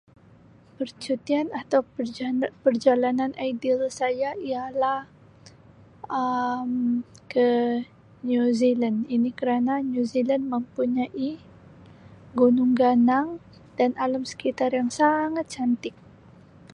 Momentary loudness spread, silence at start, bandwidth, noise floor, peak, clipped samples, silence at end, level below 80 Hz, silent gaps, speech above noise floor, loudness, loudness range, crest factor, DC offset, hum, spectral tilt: 11 LU; 0.8 s; 10.5 kHz; -53 dBFS; -6 dBFS; under 0.1%; 0.8 s; -64 dBFS; none; 29 dB; -25 LUFS; 4 LU; 18 dB; under 0.1%; none; -5.5 dB/octave